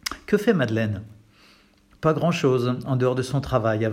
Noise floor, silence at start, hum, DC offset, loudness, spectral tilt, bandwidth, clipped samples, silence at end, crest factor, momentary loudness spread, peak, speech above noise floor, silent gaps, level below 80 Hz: -56 dBFS; 0.05 s; none; under 0.1%; -23 LUFS; -6.5 dB/octave; 16 kHz; under 0.1%; 0 s; 18 dB; 5 LU; -6 dBFS; 34 dB; none; -50 dBFS